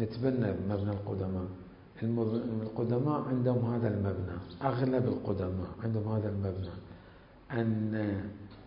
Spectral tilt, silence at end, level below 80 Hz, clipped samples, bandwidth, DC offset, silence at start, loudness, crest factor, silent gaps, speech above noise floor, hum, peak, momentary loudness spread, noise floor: -12 dB/octave; 0 s; -52 dBFS; under 0.1%; 5.4 kHz; under 0.1%; 0 s; -33 LUFS; 16 dB; none; 23 dB; none; -16 dBFS; 10 LU; -55 dBFS